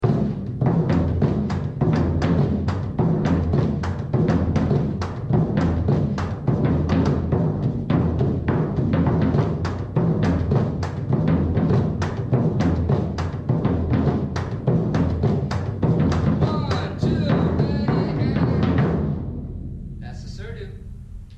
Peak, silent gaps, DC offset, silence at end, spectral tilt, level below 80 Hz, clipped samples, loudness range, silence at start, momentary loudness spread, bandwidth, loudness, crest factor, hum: -8 dBFS; none; under 0.1%; 0 s; -9 dB/octave; -34 dBFS; under 0.1%; 1 LU; 0 s; 7 LU; 7.8 kHz; -22 LUFS; 14 dB; none